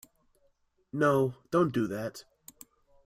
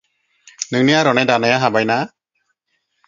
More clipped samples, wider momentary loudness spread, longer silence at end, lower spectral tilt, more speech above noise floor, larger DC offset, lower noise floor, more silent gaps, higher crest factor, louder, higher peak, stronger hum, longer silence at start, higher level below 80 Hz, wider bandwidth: neither; first, 14 LU vs 11 LU; second, 0.85 s vs 1 s; first, -7 dB/octave vs -4.5 dB/octave; second, 42 dB vs 55 dB; neither; about the same, -71 dBFS vs -70 dBFS; neither; about the same, 18 dB vs 18 dB; second, -29 LUFS vs -15 LUFS; second, -12 dBFS vs 0 dBFS; neither; first, 0.95 s vs 0.6 s; second, -68 dBFS vs -62 dBFS; first, 16 kHz vs 7.6 kHz